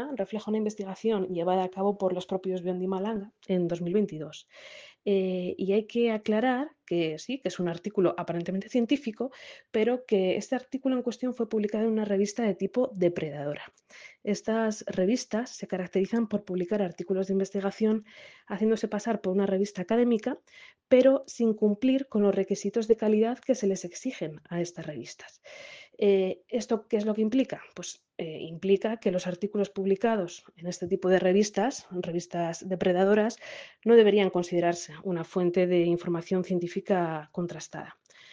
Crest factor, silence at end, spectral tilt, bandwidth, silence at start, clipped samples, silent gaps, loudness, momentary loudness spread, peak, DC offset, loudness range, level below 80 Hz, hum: 20 dB; 0.4 s; -6 dB/octave; 9.6 kHz; 0 s; under 0.1%; none; -28 LUFS; 13 LU; -8 dBFS; under 0.1%; 5 LU; -70 dBFS; none